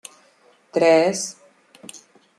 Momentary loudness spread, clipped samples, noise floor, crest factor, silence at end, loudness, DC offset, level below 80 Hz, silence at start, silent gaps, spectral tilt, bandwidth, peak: 25 LU; under 0.1%; -57 dBFS; 20 dB; 0.4 s; -19 LUFS; under 0.1%; -74 dBFS; 0.75 s; none; -3.5 dB/octave; 13 kHz; -4 dBFS